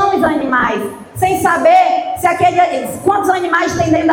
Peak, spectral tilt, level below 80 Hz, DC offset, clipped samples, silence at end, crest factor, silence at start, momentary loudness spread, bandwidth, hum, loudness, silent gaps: -2 dBFS; -5 dB/octave; -44 dBFS; under 0.1%; under 0.1%; 0 s; 12 dB; 0 s; 7 LU; 17 kHz; none; -13 LUFS; none